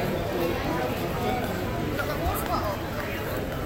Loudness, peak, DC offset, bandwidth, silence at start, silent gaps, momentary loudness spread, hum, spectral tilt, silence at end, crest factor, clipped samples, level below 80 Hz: -28 LUFS; -14 dBFS; under 0.1%; 17 kHz; 0 s; none; 3 LU; none; -5.5 dB/octave; 0 s; 14 dB; under 0.1%; -38 dBFS